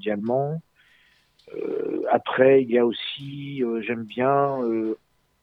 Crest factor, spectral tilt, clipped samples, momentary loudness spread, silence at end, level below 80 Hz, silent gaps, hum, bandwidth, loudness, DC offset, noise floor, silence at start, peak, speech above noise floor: 20 dB; -8.5 dB/octave; under 0.1%; 16 LU; 0.45 s; -68 dBFS; none; none; 5.2 kHz; -23 LUFS; under 0.1%; -60 dBFS; 0 s; -4 dBFS; 38 dB